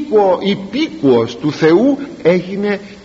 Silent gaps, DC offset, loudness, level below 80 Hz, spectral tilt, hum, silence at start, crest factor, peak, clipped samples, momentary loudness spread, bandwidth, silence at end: none; under 0.1%; -14 LUFS; -52 dBFS; -5 dB/octave; none; 0 s; 14 dB; 0 dBFS; under 0.1%; 8 LU; 7.8 kHz; 0.05 s